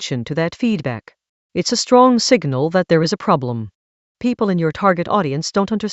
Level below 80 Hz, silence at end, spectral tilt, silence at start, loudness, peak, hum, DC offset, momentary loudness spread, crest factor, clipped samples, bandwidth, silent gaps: -56 dBFS; 0 s; -5 dB/octave; 0 s; -17 LUFS; 0 dBFS; none; under 0.1%; 13 LU; 18 dB; under 0.1%; 8.2 kHz; 1.29-1.50 s, 3.75-4.15 s